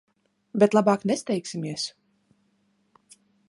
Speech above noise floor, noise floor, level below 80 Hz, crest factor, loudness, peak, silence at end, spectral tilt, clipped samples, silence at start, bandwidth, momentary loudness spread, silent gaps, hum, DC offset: 45 dB; -69 dBFS; -74 dBFS; 22 dB; -25 LUFS; -4 dBFS; 1.6 s; -5.5 dB/octave; under 0.1%; 0.55 s; 11.5 kHz; 13 LU; none; none; under 0.1%